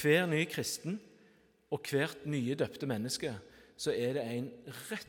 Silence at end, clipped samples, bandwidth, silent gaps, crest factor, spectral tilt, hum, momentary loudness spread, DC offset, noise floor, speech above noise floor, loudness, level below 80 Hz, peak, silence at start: 0.05 s; under 0.1%; 18 kHz; none; 20 dB; -4.5 dB/octave; none; 10 LU; under 0.1%; -66 dBFS; 31 dB; -35 LUFS; -74 dBFS; -16 dBFS; 0 s